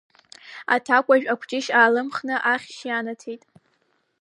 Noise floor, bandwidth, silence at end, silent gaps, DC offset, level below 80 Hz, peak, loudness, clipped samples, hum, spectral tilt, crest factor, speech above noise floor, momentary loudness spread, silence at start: -68 dBFS; 11 kHz; 0.85 s; none; under 0.1%; -80 dBFS; -4 dBFS; -21 LUFS; under 0.1%; none; -3 dB/octave; 20 dB; 47 dB; 18 LU; 0.45 s